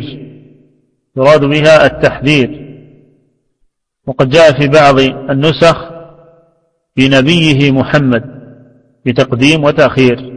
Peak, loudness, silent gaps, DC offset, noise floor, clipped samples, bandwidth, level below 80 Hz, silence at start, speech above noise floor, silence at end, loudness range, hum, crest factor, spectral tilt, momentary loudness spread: 0 dBFS; -9 LUFS; none; under 0.1%; -60 dBFS; 0.8%; 11 kHz; -38 dBFS; 0 s; 51 dB; 0 s; 2 LU; none; 10 dB; -6 dB/octave; 17 LU